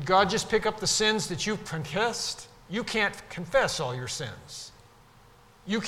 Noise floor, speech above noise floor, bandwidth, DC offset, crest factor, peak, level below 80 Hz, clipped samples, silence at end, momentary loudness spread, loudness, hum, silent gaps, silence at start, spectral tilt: -56 dBFS; 28 dB; 16.5 kHz; under 0.1%; 20 dB; -8 dBFS; -54 dBFS; under 0.1%; 0 s; 17 LU; -27 LUFS; none; none; 0 s; -3 dB/octave